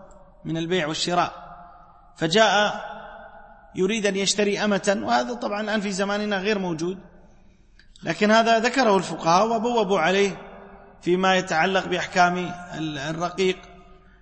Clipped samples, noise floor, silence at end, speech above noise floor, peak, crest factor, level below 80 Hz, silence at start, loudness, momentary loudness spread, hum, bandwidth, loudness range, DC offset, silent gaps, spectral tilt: under 0.1%; -52 dBFS; 0.25 s; 30 dB; -4 dBFS; 20 dB; -54 dBFS; 0 s; -22 LUFS; 15 LU; none; 8.8 kHz; 3 LU; under 0.1%; none; -4 dB/octave